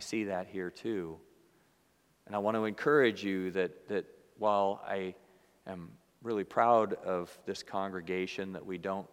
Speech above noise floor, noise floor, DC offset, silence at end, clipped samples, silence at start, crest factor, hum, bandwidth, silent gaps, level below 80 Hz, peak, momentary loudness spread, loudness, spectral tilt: 37 dB; -70 dBFS; under 0.1%; 0.05 s; under 0.1%; 0 s; 22 dB; none; 16 kHz; none; -76 dBFS; -12 dBFS; 19 LU; -33 LUFS; -5.5 dB/octave